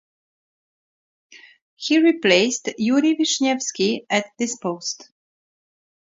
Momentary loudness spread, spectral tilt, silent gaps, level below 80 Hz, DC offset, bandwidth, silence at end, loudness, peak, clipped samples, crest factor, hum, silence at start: 11 LU; -3 dB/octave; 1.62-1.77 s; -72 dBFS; under 0.1%; 7.8 kHz; 1.1 s; -20 LUFS; -2 dBFS; under 0.1%; 20 dB; none; 1.35 s